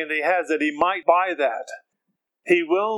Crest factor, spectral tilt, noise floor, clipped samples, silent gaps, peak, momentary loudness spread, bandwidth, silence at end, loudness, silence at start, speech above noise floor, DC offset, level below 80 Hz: 20 dB; -4.5 dB/octave; -78 dBFS; under 0.1%; none; -4 dBFS; 18 LU; 11.5 kHz; 0 s; -21 LUFS; 0 s; 56 dB; under 0.1%; -70 dBFS